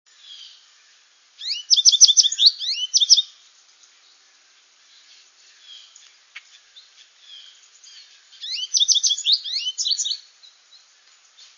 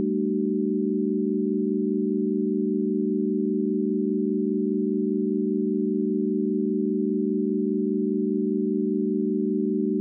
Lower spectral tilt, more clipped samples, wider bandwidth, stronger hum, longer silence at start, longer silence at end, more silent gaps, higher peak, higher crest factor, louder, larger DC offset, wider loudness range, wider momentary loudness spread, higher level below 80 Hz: second, 9.5 dB/octave vs -20 dB/octave; neither; first, 11 kHz vs 0.5 kHz; neither; first, 0.3 s vs 0 s; first, 1.4 s vs 0 s; neither; first, 0 dBFS vs -14 dBFS; first, 24 dB vs 10 dB; first, -16 LUFS vs -25 LUFS; neither; first, 8 LU vs 0 LU; first, 19 LU vs 0 LU; about the same, under -90 dBFS vs -88 dBFS